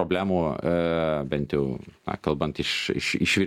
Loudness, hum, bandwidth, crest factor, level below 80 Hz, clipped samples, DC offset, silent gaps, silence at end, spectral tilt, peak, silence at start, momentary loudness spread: -26 LUFS; none; 16 kHz; 18 dB; -48 dBFS; under 0.1%; under 0.1%; none; 0 s; -5 dB/octave; -8 dBFS; 0 s; 7 LU